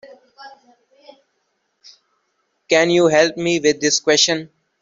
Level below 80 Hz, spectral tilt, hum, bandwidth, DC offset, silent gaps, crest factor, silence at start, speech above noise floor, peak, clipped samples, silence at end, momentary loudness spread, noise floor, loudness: -62 dBFS; -2.5 dB/octave; none; 7.8 kHz; under 0.1%; none; 18 dB; 0.05 s; 54 dB; -2 dBFS; under 0.1%; 0.35 s; 4 LU; -70 dBFS; -16 LUFS